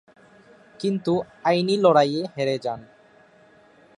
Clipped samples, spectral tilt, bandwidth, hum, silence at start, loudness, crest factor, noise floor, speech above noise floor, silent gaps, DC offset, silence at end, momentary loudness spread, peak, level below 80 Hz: under 0.1%; -6 dB/octave; 11 kHz; none; 0.8 s; -22 LUFS; 20 dB; -54 dBFS; 32 dB; none; under 0.1%; 1.15 s; 12 LU; -4 dBFS; -68 dBFS